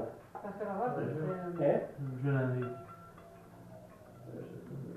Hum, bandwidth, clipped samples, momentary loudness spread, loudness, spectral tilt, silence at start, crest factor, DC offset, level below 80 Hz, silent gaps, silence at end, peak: none; 13.5 kHz; under 0.1%; 22 LU; -36 LUFS; -9.5 dB/octave; 0 s; 20 dB; under 0.1%; -68 dBFS; none; 0 s; -16 dBFS